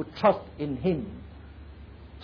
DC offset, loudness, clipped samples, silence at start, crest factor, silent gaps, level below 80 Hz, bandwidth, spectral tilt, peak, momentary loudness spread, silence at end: under 0.1%; -28 LUFS; under 0.1%; 0 s; 20 dB; none; -48 dBFS; 5.4 kHz; -9 dB/octave; -10 dBFS; 23 LU; 0 s